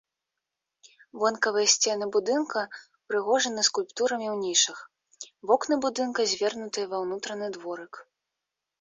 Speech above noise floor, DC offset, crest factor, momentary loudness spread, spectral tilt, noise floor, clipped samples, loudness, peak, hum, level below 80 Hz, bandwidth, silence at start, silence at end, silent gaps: 59 dB; under 0.1%; 22 dB; 15 LU; -1 dB/octave; -86 dBFS; under 0.1%; -26 LUFS; -6 dBFS; none; -76 dBFS; 8 kHz; 1.15 s; 0.8 s; none